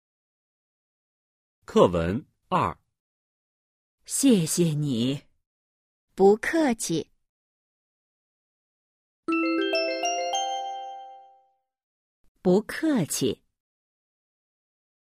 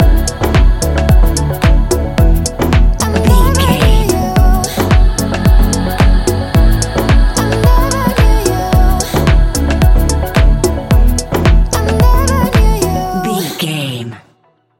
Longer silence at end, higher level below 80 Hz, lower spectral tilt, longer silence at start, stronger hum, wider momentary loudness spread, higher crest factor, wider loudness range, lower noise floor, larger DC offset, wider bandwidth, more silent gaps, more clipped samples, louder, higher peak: first, 1.85 s vs 0.6 s; second, -58 dBFS vs -12 dBFS; about the same, -5 dB/octave vs -5.5 dB/octave; first, 1.7 s vs 0 s; first, 60 Hz at -55 dBFS vs none; first, 15 LU vs 4 LU; first, 24 dB vs 10 dB; first, 5 LU vs 1 LU; first, -65 dBFS vs -53 dBFS; neither; about the same, 15.5 kHz vs 17 kHz; first, 3.00-3.98 s, 5.46-6.08 s, 7.29-9.23 s, 11.83-12.35 s vs none; neither; second, -25 LUFS vs -12 LUFS; second, -4 dBFS vs 0 dBFS